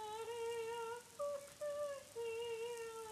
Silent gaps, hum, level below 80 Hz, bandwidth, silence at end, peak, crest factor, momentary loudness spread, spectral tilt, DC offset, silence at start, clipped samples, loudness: none; none; -80 dBFS; 15.5 kHz; 0 s; -34 dBFS; 12 dB; 3 LU; -2 dB/octave; under 0.1%; 0 s; under 0.1%; -46 LUFS